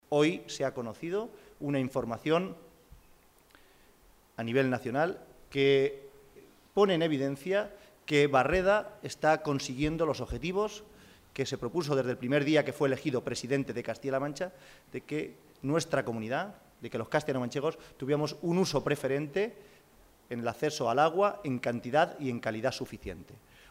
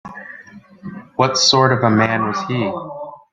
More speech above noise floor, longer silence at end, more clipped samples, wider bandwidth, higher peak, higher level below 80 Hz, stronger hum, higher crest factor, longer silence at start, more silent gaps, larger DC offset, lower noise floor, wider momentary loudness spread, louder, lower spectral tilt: first, 31 dB vs 25 dB; first, 0.35 s vs 0.15 s; neither; first, 16 kHz vs 9.4 kHz; second, -12 dBFS vs -2 dBFS; about the same, -56 dBFS vs -56 dBFS; neither; about the same, 20 dB vs 18 dB; about the same, 0.1 s vs 0.05 s; neither; neither; first, -61 dBFS vs -41 dBFS; second, 14 LU vs 22 LU; second, -31 LUFS vs -16 LUFS; first, -5.5 dB/octave vs -4 dB/octave